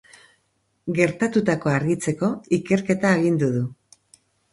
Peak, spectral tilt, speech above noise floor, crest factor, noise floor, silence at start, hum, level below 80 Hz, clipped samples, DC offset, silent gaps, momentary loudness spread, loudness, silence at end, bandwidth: -2 dBFS; -6.5 dB/octave; 48 dB; 22 dB; -69 dBFS; 0.85 s; none; -58 dBFS; under 0.1%; under 0.1%; none; 8 LU; -22 LUFS; 0.8 s; 11.5 kHz